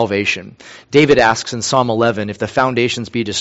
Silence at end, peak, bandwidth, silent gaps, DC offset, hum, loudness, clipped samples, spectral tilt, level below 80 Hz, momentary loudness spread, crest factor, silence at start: 0 s; 0 dBFS; 8.2 kHz; none; under 0.1%; none; -15 LUFS; under 0.1%; -4.5 dB/octave; -46 dBFS; 9 LU; 16 dB; 0 s